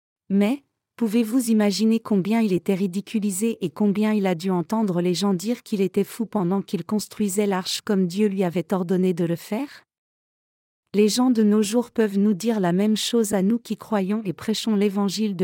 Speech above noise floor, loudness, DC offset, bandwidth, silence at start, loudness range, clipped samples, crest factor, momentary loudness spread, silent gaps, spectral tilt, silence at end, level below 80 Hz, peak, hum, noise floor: over 68 dB; -23 LUFS; under 0.1%; 17 kHz; 0.3 s; 3 LU; under 0.1%; 14 dB; 6 LU; 9.98-10.83 s; -5.5 dB/octave; 0 s; -70 dBFS; -8 dBFS; none; under -90 dBFS